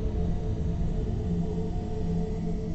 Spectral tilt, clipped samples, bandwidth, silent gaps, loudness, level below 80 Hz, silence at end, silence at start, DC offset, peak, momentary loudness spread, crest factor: -9 dB/octave; under 0.1%; 8 kHz; none; -31 LUFS; -32 dBFS; 0 s; 0 s; under 0.1%; -16 dBFS; 2 LU; 12 dB